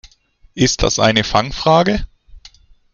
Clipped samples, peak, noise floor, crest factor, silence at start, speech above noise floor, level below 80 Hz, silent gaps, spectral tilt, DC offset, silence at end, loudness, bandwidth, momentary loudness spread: under 0.1%; 0 dBFS; -51 dBFS; 16 dB; 0.55 s; 37 dB; -32 dBFS; none; -4 dB/octave; under 0.1%; 0.45 s; -15 LUFS; 10 kHz; 7 LU